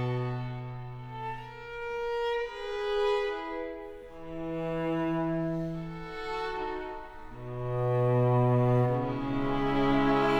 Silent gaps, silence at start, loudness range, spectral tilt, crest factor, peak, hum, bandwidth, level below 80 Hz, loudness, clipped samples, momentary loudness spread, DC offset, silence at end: none; 0 s; 6 LU; -8 dB/octave; 16 dB; -14 dBFS; none; 7.8 kHz; -46 dBFS; -31 LUFS; under 0.1%; 16 LU; under 0.1%; 0 s